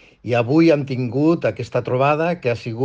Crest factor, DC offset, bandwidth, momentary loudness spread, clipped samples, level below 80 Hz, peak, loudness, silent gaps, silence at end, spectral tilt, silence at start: 14 dB; under 0.1%; 7.6 kHz; 8 LU; under 0.1%; -56 dBFS; -4 dBFS; -19 LUFS; none; 0 s; -8 dB/octave; 0.25 s